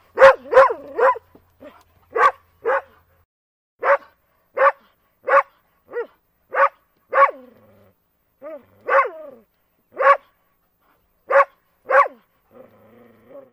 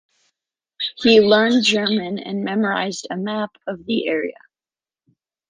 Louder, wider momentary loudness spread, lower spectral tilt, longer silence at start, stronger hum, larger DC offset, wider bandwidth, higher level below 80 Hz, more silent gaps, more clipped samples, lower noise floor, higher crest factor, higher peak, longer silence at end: about the same, -18 LUFS vs -19 LUFS; first, 18 LU vs 13 LU; about the same, -3.5 dB/octave vs -4.5 dB/octave; second, 0.15 s vs 0.8 s; neither; neither; second, 8.6 kHz vs 9.8 kHz; about the same, -62 dBFS vs -62 dBFS; first, 3.25-3.79 s vs none; neither; second, -66 dBFS vs under -90 dBFS; about the same, 20 dB vs 18 dB; about the same, 0 dBFS vs -2 dBFS; second, 0.15 s vs 1.2 s